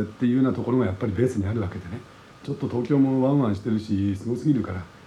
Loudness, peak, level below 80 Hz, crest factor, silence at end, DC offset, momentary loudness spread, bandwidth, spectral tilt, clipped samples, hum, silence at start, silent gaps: -24 LUFS; -8 dBFS; -58 dBFS; 16 dB; 0.15 s; under 0.1%; 12 LU; 11 kHz; -8.5 dB/octave; under 0.1%; none; 0 s; none